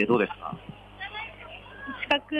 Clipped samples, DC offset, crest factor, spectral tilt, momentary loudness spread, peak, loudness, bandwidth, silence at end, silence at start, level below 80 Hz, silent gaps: under 0.1%; under 0.1%; 20 dB; -6.5 dB/octave; 17 LU; -10 dBFS; -31 LUFS; 9.2 kHz; 0 s; 0 s; -56 dBFS; none